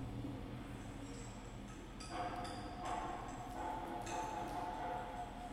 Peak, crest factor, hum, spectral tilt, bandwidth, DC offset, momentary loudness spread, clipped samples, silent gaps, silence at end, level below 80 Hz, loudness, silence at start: -30 dBFS; 16 dB; none; -5 dB/octave; 16 kHz; under 0.1%; 7 LU; under 0.1%; none; 0 s; -56 dBFS; -46 LUFS; 0 s